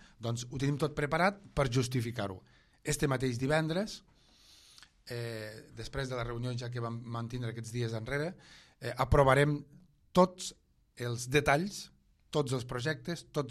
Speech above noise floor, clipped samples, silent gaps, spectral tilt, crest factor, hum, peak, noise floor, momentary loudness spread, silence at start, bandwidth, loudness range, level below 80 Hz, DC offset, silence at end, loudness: 29 dB; under 0.1%; none; -5.5 dB/octave; 22 dB; none; -12 dBFS; -61 dBFS; 15 LU; 0.2 s; 14.5 kHz; 9 LU; -50 dBFS; under 0.1%; 0 s; -33 LUFS